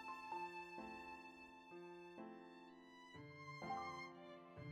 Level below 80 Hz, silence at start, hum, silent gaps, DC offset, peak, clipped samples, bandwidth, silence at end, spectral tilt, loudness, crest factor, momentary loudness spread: -82 dBFS; 0 s; none; none; under 0.1%; -36 dBFS; under 0.1%; 14 kHz; 0 s; -5.5 dB/octave; -54 LUFS; 18 dB; 12 LU